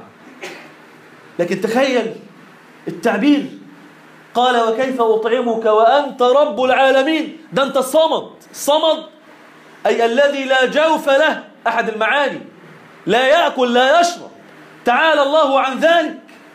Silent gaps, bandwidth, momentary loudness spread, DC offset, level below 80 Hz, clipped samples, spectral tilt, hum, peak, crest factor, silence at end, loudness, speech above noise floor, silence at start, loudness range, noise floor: none; 15.5 kHz; 15 LU; under 0.1%; -68 dBFS; under 0.1%; -3.5 dB/octave; none; -4 dBFS; 14 dB; 0.35 s; -15 LUFS; 28 dB; 0 s; 5 LU; -43 dBFS